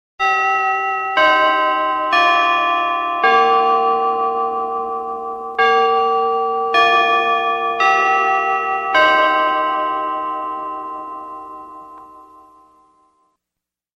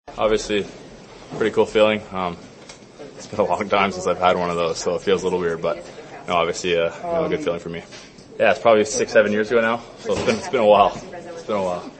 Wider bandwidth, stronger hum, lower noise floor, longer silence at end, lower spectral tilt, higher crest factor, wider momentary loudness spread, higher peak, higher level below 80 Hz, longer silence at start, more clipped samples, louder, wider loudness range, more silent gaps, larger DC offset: about the same, 8.4 kHz vs 8.8 kHz; neither; first, -84 dBFS vs -42 dBFS; first, 1.75 s vs 0 s; second, -2.5 dB/octave vs -4 dB/octave; about the same, 16 dB vs 20 dB; second, 13 LU vs 19 LU; about the same, -2 dBFS vs 0 dBFS; second, -58 dBFS vs -50 dBFS; first, 0.2 s vs 0.05 s; neither; first, -16 LUFS vs -20 LUFS; first, 12 LU vs 5 LU; neither; neither